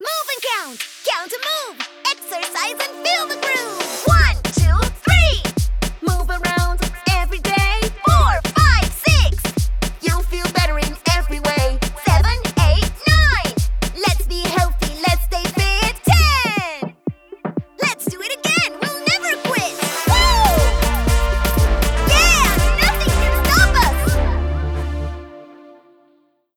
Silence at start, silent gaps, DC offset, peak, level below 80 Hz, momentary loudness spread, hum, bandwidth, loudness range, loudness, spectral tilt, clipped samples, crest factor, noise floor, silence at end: 0 s; none; under 0.1%; 0 dBFS; -20 dBFS; 9 LU; none; 19.5 kHz; 4 LU; -17 LUFS; -4 dB/octave; under 0.1%; 16 dB; -58 dBFS; 1.05 s